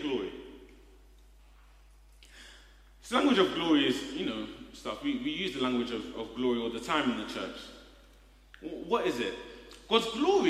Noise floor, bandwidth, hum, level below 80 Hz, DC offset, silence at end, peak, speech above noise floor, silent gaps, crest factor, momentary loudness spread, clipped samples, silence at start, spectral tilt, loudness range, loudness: -57 dBFS; 15 kHz; none; -58 dBFS; under 0.1%; 0 s; -10 dBFS; 27 dB; none; 22 dB; 22 LU; under 0.1%; 0 s; -4.5 dB/octave; 5 LU; -31 LUFS